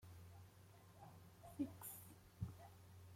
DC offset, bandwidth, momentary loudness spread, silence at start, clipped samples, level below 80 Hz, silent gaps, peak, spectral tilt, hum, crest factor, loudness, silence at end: under 0.1%; 16.5 kHz; 15 LU; 0 s; under 0.1%; -72 dBFS; none; -34 dBFS; -6 dB/octave; none; 22 dB; -56 LUFS; 0 s